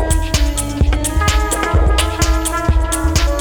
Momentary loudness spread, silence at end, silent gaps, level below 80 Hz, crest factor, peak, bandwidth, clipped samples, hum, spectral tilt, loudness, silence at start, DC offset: 2 LU; 0 s; none; -16 dBFS; 10 dB; -4 dBFS; over 20 kHz; under 0.1%; none; -4 dB/octave; -16 LUFS; 0 s; under 0.1%